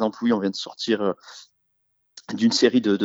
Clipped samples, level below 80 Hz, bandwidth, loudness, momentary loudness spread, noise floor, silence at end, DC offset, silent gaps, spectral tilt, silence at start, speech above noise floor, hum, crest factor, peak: under 0.1%; -72 dBFS; 8 kHz; -22 LUFS; 17 LU; -71 dBFS; 0 s; under 0.1%; none; -4.5 dB/octave; 0 s; 49 dB; none; 20 dB; -4 dBFS